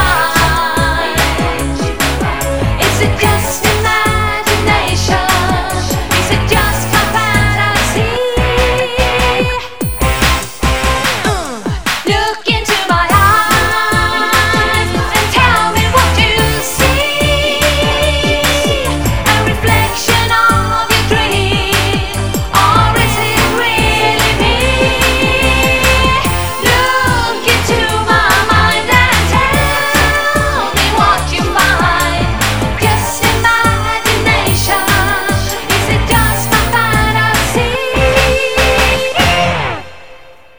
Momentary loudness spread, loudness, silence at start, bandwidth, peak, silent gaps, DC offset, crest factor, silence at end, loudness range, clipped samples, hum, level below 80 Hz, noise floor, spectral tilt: 5 LU; -11 LUFS; 0 s; over 20 kHz; 0 dBFS; none; 4%; 12 dB; 0 s; 3 LU; under 0.1%; none; -22 dBFS; -38 dBFS; -3.5 dB/octave